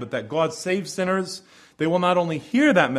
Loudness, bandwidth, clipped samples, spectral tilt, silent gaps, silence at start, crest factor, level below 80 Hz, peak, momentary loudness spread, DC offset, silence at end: -23 LUFS; 13.5 kHz; under 0.1%; -5 dB/octave; none; 0 s; 18 dB; -64 dBFS; -4 dBFS; 9 LU; under 0.1%; 0 s